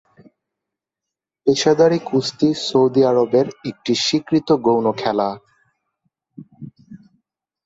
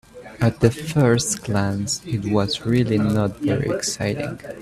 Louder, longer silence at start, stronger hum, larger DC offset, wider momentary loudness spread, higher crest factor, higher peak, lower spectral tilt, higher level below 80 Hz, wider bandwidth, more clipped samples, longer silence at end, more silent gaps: first, -18 LUFS vs -21 LUFS; first, 1.45 s vs 0.15 s; neither; neither; first, 10 LU vs 6 LU; about the same, 18 dB vs 20 dB; about the same, -2 dBFS vs 0 dBFS; about the same, -5 dB/octave vs -5.5 dB/octave; second, -60 dBFS vs -46 dBFS; second, 8 kHz vs 14.5 kHz; neither; first, 0.7 s vs 0 s; neither